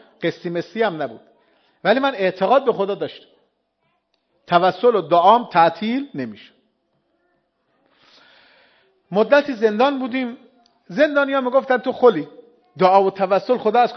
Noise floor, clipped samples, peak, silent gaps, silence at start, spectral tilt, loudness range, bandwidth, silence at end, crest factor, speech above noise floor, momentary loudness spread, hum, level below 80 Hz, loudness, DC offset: -69 dBFS; under 0.1%; 0 dBFS; none; 0.2 s; -7 dB/octave; 6 LU; 6.4 kHz; 0 s; 20 dB; 52 dB; 14 LU; none; -72 dBFS; -18 LUFS; under 0.1%